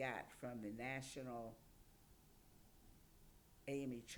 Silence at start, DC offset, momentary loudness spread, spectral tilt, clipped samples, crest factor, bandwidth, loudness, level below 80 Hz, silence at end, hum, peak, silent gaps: 0 s; under 0.1%; 22 LU; -5 dB/octave; under 0.1%; 20 dB; over 20 kHz; -50 LUFS; -72 dBFS; 0 s; none; -30 dBFS; none